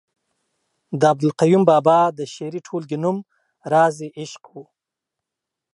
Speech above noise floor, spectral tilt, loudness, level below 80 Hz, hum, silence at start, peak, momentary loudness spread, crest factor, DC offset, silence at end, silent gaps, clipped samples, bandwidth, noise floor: 66 dB; -6.5 dB/octave; -18 LUFS; -72 dBFS; none; 0.9 s; -2 dBFS; 19 LU; 20 dB; under 0.1%; 1.15 s; none; under 0.1%; 11.5 kHz; -84 dBFS